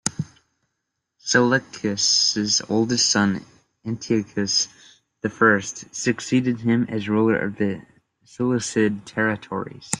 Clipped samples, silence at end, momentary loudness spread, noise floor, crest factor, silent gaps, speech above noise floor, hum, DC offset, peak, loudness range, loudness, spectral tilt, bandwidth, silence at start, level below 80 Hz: under 0.1%; 0 s; 13 LU; -79 dBFS; 22 dB; none; 57 dB; none; under 0.1%; 0 dBFS; 3 LU; -21 LUFS; -3.5 dB/octave; 12 kHz; 0.05 s; -60 dBFS